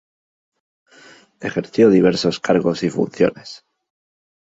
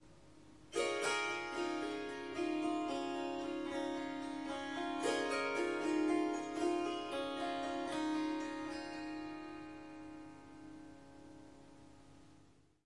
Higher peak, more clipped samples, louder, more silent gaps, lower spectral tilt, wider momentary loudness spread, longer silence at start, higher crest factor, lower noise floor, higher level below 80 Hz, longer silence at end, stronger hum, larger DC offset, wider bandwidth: first, -2 dBFS vs -24 dBFS; neither; first, -17 LUFS vs -39 LUFS; neither; first, -6 dB/octave vs -3.5 dB/octave; second, 16 LU vs 19 LU; first, 1.4 s vs 0 s; about the same, 18 dB vs 16 dB; second, -47 dBFS vs -67 dBFS; first, -56 dBFS vs -72 dBFS; first, 0.95 s vs 0.45 s; second, none vs 50 Hz at -70 dBFS; neither; second, 8 kHz vs 11.5 kHz